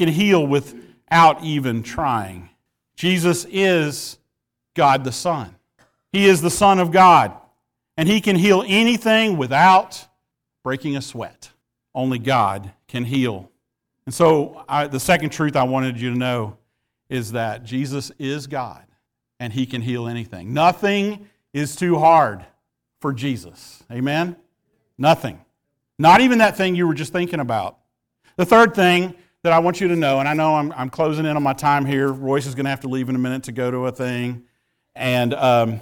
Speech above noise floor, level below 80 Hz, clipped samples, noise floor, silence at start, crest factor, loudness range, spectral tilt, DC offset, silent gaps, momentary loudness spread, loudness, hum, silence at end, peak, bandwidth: 60 dB; -54 dBFS; under 0.1%; -78 dBFS; 0 s; 16 dB; 8 LU; -5.5 dB/octave; under 0.1%; none; 16 LU; -18 LUFS; none; 0 s; -4 dBFS; 18.5 kHz